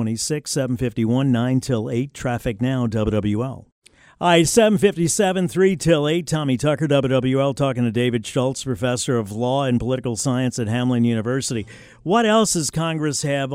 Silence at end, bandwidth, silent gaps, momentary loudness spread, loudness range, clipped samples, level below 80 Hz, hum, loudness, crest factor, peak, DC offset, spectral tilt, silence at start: 0 s; 16 kHz; 3.72-3.82 s; 7 LU; 4 LU; under 0.1%; -46 dBFS; none; -20 LUFS; 18 dB; -2 dBFS; under 0.1%; -5 dB/octave; 0 s